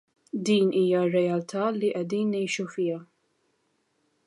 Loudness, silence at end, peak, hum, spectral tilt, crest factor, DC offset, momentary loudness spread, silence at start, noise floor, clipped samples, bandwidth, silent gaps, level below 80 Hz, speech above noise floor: -26 LUFS; 1.25 s; -12 dBFS; none; -6 dB/octave; 16 dB; under 0.1%; 8 LU; 0.35 s; -72 dBFS; under 0.1%; 11.5 kHz; none; -76 dBFS; 47 dB